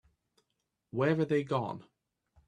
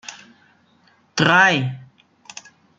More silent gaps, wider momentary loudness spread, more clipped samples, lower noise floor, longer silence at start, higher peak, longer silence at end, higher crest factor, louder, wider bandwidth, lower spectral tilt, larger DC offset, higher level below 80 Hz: neither; second, 12 LU vs 26 LU; neither; first, -83 dBFS vs -58 dBFS; first, 0.95 s vs 0.1 s; second, -14 dBFS vs -2 dBFS; second, 0.65 s vs 0.95 s; about the same, 20 dB vs 20 dB; second, -32 LUFS vs -17 LUFS; first, 10.5 kHz vs 9.2 kHz; first, -8 dB/octave vs -4 dB/octave; neither; second, -72 dBFS vs -62 dBFS